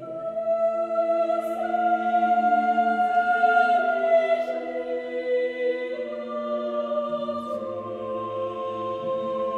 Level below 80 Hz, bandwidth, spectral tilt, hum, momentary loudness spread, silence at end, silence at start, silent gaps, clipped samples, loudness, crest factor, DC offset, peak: -68 dBFS; 8 kHz; -6 dB/octave; none; 10 LU; 0 s; 0 s; none; under 0.1%; -25 LUFS; 16 dB; under 0.1%; -10 dBFS